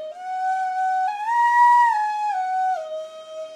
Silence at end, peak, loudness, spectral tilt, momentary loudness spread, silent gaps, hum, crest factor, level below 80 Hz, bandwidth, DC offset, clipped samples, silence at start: 0 s; -8 dBFS; -20 LUFS; 0.5 dB/octave; 17 LU; none; none; 14 dB; under -90 dBFS; 11 kHz; under 0.1%; under 0.1%; 0 s